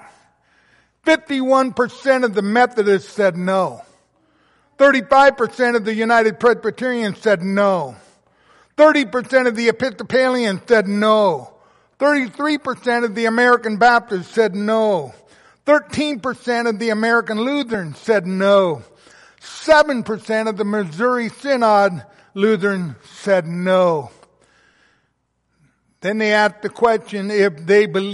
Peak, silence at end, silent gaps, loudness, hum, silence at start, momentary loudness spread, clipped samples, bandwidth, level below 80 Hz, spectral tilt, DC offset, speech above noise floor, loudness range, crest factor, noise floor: -2 dBFS; 0 s; none; -17 LUFS; none; 1.05 s; 9 LU; under 0.1%; 11.5 kHz; -60 dBFS; -5.5 dB/octave; under 0.1%; 51 dB; 4 LU; 16 dB; -68 dBFS